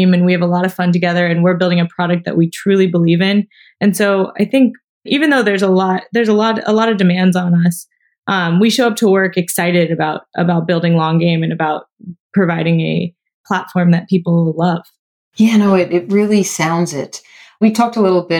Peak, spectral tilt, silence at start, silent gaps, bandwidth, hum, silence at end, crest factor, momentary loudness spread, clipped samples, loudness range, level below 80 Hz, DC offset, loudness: -2 dBFS; -6 dB/octave; 0 s; 4.84-5.01 s, 8.18-8.22 s, 12.20-12.30 s, 13.34-13.44 s, 14.99-15.31 s; 18 kHz; none; 0 s; 12 dB; 6 LU; under 0.1%; 3 LU; -66 dBFS; under 0.1%; -14 LUFS